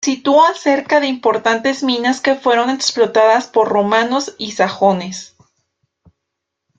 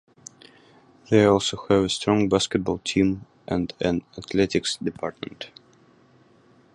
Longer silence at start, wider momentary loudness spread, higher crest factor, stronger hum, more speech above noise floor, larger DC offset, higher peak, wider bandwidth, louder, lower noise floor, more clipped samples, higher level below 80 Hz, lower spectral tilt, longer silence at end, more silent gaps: second, 0 s vs 1.1 s; second, 7 LU vs 17 LU; second, 14 dB vs 20 dB; neither; first, 63 dB vs 34 dB; neither; about the same, -2 dBFS vs -4 dBFS; second, 9.2 kHz vs 11.5 kHz; first, -15 LUFS vs -23 LUFS; first, -78 dBFS vs -57 dBFS; neither; second, -62 dBFS vs -50 dBFS; second, -3.5 dB/octave vs -5 dB/octave; first, 1.55 s vs 1.25 s; neither